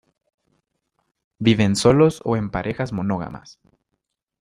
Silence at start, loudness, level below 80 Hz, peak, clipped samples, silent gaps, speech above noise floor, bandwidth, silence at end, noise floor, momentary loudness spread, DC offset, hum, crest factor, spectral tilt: 1.4 s; -20 LUFS; -48 dBFS; -2 dBFS; under 0.1%; none; 58 dB; 15 kHz; 0.9 s; -78 dBFS; 12 LU; under 0.1%; none; 20 dB; -6 dB/octave